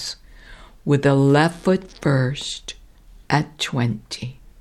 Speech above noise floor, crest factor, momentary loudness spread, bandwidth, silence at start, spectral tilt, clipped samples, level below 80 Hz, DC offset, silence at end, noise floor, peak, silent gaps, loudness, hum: 27 dB; 18 dB; 17 LU; 12.5 kHz; 0 s; -6 dB/octave; under 0.1%; -48 dBFS; under 0.1%; 0.3 s; -46 dBFS; -4 dBFS; none; -21 LUFS; none